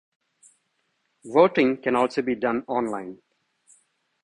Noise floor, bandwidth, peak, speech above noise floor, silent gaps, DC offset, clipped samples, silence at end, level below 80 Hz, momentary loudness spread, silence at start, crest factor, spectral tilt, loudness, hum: -73 dBFS; 10.5 kHz; -2 dBFS; 51 dB; none; under 0.1%; under 0.1%; 1.1 s; -66 dBFS; 11 LU; 1.25 s; 24 dB; -6 dB/octave; -23 LUFS; none